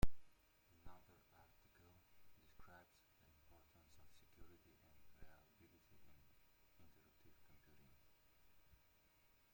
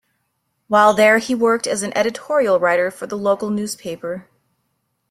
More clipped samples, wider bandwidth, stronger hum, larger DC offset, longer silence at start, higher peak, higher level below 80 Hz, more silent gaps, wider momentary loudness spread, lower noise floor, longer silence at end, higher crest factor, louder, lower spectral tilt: neither; about the same, 16.5 kHz vs 15.5 kHz; neither; neither; second, 0 s vs 0.7 s; second, -24 dBFS vs -2 dBFS; about the same, -60 dBFS vs -62 dBFS; neither; second, 5 LU vs 14 LU; first, -75 dBFS vs -71 dBFS; about the same, 0.95 s vs 0.9 s; first, 26 dB vs 18 dB; second, -62 LUFS vs -17 LUFS; first, -6 dB/octave vs -4 dB/octave